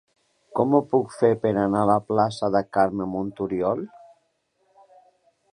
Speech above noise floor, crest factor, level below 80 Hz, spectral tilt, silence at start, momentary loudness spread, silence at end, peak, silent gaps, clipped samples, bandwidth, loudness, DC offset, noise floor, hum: 48 dB; 18 dB; -58 dBFS; -7.5 dB/octave; 0.55 s; 8 LU; 1.65 s; -6 dBFS; none; under 0.1%; 11 kHz; -23 LUFS; under 0.1%; -70 dBFS; none